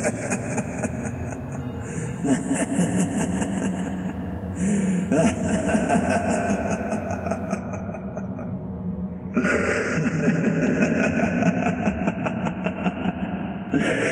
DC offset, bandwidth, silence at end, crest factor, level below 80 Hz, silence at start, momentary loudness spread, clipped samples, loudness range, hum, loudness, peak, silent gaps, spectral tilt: under 0.1%; 12 kHz; 0 s; 16 dB; -44 dBFS; 0 s; 10 LU; under 0.1%; 4 LU; none; -24 LUFS; -6 dBFS; none; -6 dB/octave